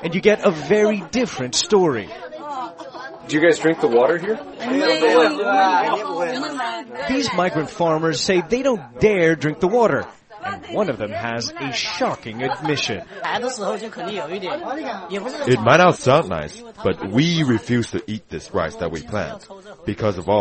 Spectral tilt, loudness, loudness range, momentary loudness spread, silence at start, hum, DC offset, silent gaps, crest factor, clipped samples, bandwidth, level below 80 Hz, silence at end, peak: -5 dB/octave; -20 LUFS; 6 LU; 14 LU; 0 s; none; under 0.1%; none; 20 dB; under 0.1%; 8.8 kHz; -52 dBFS; 0 s; 0 dBFS